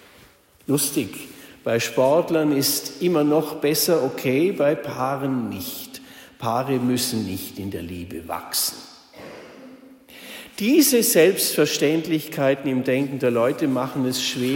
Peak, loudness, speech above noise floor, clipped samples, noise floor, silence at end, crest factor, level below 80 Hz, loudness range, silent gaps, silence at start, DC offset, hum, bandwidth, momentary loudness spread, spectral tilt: -4 dBFS; -21 LUFS; 31 dB; under 0.1%; -53 dBFS; 0 s; 18 dB; -60 dBFS; 7 LU; none; 0.7 s; under 0.1%; none; 16.5 kHz; 20 LU; -4 dB/octave